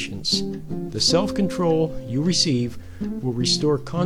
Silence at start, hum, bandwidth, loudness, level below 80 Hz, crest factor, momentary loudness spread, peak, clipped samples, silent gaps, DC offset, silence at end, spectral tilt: 0 s; none; 14.5 kHz; -22 LUFS; -44 dBFS; 16 dB; 11 LU; -6 dBFS; under 0.1%; none; 1%; 0 s; -4.5 dB/octave